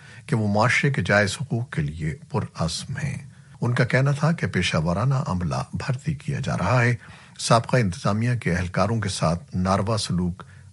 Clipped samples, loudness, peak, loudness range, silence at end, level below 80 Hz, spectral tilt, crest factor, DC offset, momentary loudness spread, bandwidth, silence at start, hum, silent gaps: under 0.1%; -24 LUFS; -4 dBFS; 2 LU; 0.15 s; -48 dBFS; -5.5 dB/octave; 20 dB; under 0.1%; 9 LU; 11.5 kHz; 0 s; none; none